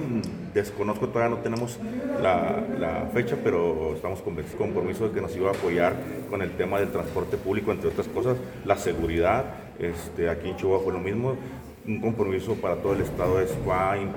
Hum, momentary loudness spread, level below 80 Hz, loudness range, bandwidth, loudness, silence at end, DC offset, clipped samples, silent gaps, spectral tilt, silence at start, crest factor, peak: none; 7 LU; -48 dBFS; 1 LU; over 20 kHz; -27 LUFS; 0 s; under 0.1%; under 0.1%; none; -7 dB/octave; 0 s; 20 dB; -6 dBFS